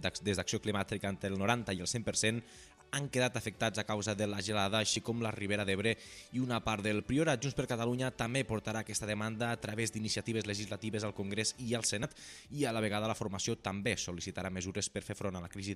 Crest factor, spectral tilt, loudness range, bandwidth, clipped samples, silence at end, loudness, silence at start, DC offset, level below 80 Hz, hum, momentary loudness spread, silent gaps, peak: 20 dB; -4 dB/octave; 3 LU; 14.5 kHz; under 0.1%; 0 s; -35 LUFS; 0 s; under 0.1%; -62 dBFS; none; 7 LU; none; -16 dBFS